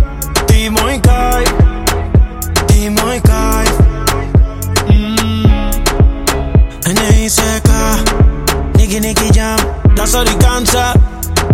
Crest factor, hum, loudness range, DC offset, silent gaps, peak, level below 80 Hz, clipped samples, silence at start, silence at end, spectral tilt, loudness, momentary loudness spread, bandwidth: 10 dB; none; 1 LU; under 0.1%; none; 0 dBFS; -14 dBFS; under 0.1%; 0 s; 0 s; -4.5 dB/octave; -12 LUFS; 4 LU; 17.5 kHz